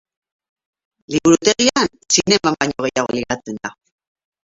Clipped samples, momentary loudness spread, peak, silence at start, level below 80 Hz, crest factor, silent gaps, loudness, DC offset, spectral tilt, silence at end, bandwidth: under 0.1%; 12 LU; 0 dBFS; 1.1 s; -52 dBFS; 20 dB; none; -17 LUFS; under 0.1%; -3 dB/octave; 0.8 s; 8 kHz